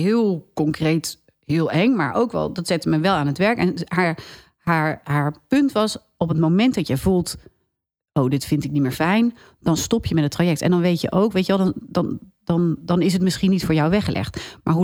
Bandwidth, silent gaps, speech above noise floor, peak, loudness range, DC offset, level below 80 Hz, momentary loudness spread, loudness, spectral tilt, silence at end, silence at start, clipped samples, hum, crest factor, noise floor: over 20 kHz; none; 60 dB; -4 dBFS; 2 LU; under 0.1%; -46 dBFS; 7 LU; -21 LUFS; -6 dB/octave; 0 s; 0 s; under 0.1%; none; 16 dB; -80 dBFS